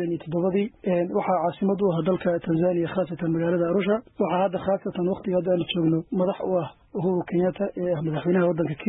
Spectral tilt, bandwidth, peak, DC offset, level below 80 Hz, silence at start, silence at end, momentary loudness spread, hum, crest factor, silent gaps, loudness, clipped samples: -12 dB/octave; 4 kHz; -10 dBFS; under 0.1%; -58 dBFS; 0 s; 0 s; 4 LU; none; 14 dB; none; -25 LUFS; under 0.1%